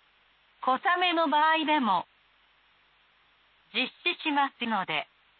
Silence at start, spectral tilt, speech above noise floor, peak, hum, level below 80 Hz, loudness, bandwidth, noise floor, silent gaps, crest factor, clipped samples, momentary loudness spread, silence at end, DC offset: 0.6 s; -7.5 dB/octave; 38 dB; -14 dBFS; none; -82 dBFS; -27 LUFS; 4.7 kHz; -65 dBFS; none; 16 dB; under 0.1%; 9 LU; 0.35 s; under 0.1%